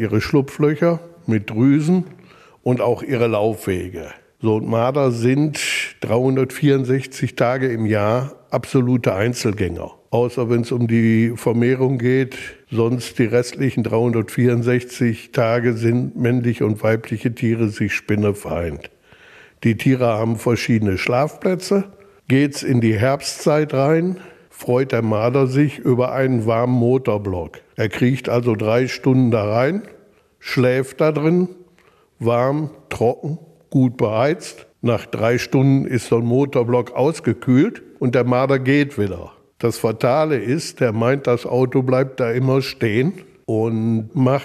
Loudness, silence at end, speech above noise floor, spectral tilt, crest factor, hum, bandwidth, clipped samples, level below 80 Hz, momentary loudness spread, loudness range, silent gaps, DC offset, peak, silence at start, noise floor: -19 LUFS; 0 s; 37 dB; -7 dB/octave; 16 dB; none; 14 kHz; under 0.1%; -52 dBFS; 8 LU; 2 LU; none; under 0.1%; -2 dBFS; 0 s; -55 dBFS